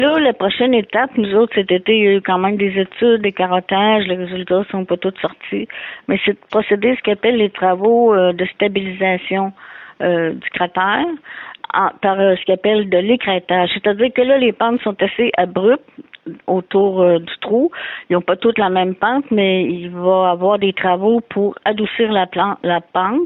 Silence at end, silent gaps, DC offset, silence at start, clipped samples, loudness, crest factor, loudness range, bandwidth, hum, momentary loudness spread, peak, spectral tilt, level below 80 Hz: 0 s; none; under 0.1%; 0 s; under 0.1%; -16 LUFS; 12 dB; 3 LU; 4.1 kHz; none; 7 LU; -4 dBFS; -9.5 dB/octave; -58 dBFS